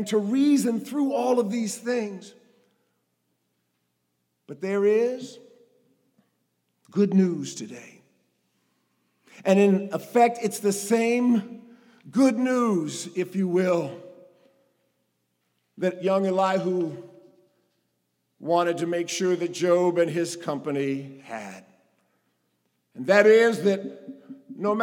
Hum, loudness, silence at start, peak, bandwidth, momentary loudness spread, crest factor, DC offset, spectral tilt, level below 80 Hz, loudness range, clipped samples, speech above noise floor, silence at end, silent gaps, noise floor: none; -24 LUFS; 0 s; -2 dBFS; 17.5 kHz; 17 LU; 22 dB; under 0.1%; -5.5 dB/octave; -88 dBFS; 6 LU; under 0.1%; 52 dB; 0 s; none; -76 dBFS